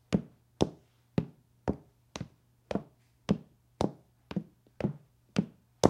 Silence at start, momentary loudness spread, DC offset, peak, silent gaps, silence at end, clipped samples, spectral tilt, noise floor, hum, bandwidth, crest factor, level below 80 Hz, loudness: 0.1 s; 14 LU; under 0.1%; -2 dBFS; none; 0 s; under 0.1%; -6.5 dB/octave; -56 dBFS; none; 12.5 kHz; 32 dB; -56 dBFS; -37 LUFS